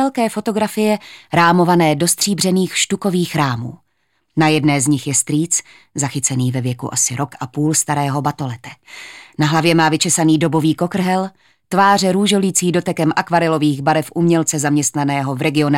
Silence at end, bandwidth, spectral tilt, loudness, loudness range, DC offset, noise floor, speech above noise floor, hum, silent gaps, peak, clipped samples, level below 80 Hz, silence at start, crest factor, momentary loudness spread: 0 s; 17 kHz; -4.5 dB/octave; -16 LUFS; 3 LU; under 0.1%; -67 dBFS; 51 dB; none; none; 0 dBFS; under 0.1%; -58 dBFS; 0 s; 16 dB; 10 LU